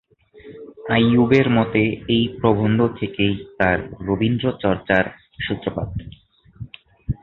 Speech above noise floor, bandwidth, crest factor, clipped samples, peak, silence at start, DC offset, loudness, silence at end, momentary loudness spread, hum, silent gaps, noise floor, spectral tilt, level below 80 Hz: 26 dB; 6.2 kHz; 18 dB; under 0.1%; -2 dBFS; 0.45 s; under 0.1%; -20 LUFS; 0.05 s; 20 LU; none; none; -45 dBFS; -8.5 dB/octave; -42 dBFS